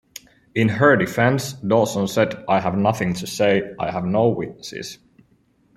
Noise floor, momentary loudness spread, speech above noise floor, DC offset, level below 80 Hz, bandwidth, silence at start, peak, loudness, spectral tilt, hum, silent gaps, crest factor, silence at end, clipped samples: -60 dBFS; 16 LU; 40 dB; under 0.1%; -56 dBFS; 16 kHz; 0.15 s; -2 dBFS; -20 LUFS; -5.5 dB/octave; none; none; 18 dB; 0.8 s; under 0.1%